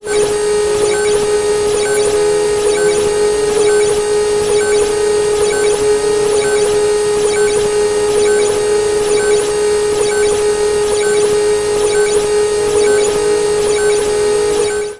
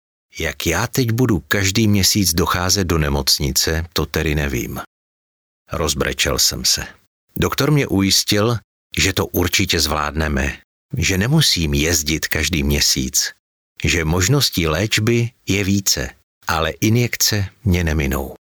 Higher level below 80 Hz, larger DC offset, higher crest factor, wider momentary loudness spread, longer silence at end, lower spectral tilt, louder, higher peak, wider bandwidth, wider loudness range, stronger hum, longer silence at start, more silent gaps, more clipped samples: second, -38 dBFS vs -32 dBFS; neither; second, 10 dB vs 16 dB; second, 2 LU vs 9 LU; second, 0 s vs 0.2 s; about the same, -2.5 dB/octave vs -3.5 dB/octave; first, -13 LUFS vs -17 LUFS; about the same, -2 dBFS vs -4 dBFS; second, 11.5 kHz vs over 20 kHz; second, 0 LU vs 3 LU; neither; second, 0.05 s vs 0.35 s; second, none vs 4.87-5.66 s, 7.07-7.28 s, 8.64-8.90 s, 10.64-10.89 s, 13.39-13.76 s, 16.23-16.41 s; neither